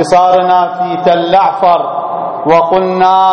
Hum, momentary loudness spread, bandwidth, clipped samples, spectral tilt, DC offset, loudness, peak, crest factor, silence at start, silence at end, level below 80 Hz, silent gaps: none; 8 LU; 10.5 kHz; 0.3%; -5.5 dB/octave; under 0.1%; -10 LUFS; 0 dBFS; 10 dB; 0 s; 0 s; -48 dBFS; none